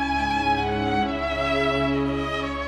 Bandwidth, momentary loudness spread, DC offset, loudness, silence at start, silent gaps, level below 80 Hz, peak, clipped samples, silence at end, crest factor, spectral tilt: 11.5 kHz; 3 LU; under 0.1%; -24 LUFS; 0 s; none; -38 dBFS; -10 dBFS; under 0.1%; 0 s; 14 dB; -6 dB/octave